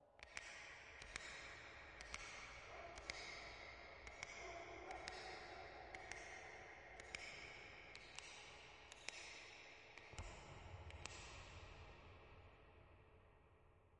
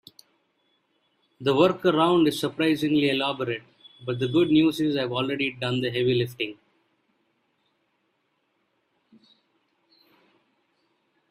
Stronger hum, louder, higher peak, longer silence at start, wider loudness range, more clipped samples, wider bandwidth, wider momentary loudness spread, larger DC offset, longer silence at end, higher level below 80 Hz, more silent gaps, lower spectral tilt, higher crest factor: neither; second, -55 LUFS vs -24 LUFS; second, -30 dBFS vs -6 dBFS; second, 0 s vs 1.4 s; second, 5 LU vs 8 LU; neither; second, 10.5 kHz vs 15 kHz; about the same, 9 LU vs 10 LU; neither; second, 0 s vs 4.75 s; about the same, -68 dBFS vs -66 dBFS; neither; second, -2.5 dB/octave vs -6 dB/octave; first, 28 dB vs 20 dB